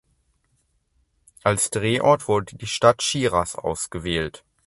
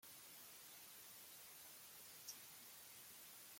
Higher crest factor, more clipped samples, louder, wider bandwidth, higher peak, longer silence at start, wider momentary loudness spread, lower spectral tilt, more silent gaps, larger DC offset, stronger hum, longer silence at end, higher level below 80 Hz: about the same, 24 dB vs 22 dB; neither; first, -22 LUFS vs -57 LUFS; second, 12 kHz vs 16.5 kHz; first, 0 dBFS vs -40 dBFS; first, 1.45 s vs 0 s; first, 9 LU vs 3 LU; first, -4 dB/octave vs 0 dB/octave; neither; neither; neither; first, 0.3 s vs 0 s; first, -48 dBFS vs under -90 dBFS